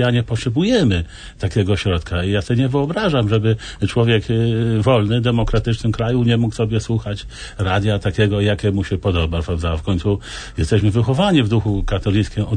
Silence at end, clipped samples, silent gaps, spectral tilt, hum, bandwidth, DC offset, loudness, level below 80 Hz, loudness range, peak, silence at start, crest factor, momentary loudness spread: 0 s; under 0.1%; none; -7 dB/octave; none; 9.6 kHz; under 0.1%; -18 LUFS; -32 dBFS; 2 LU; -2 dBFS; 0 s; 14 dB; 6 LU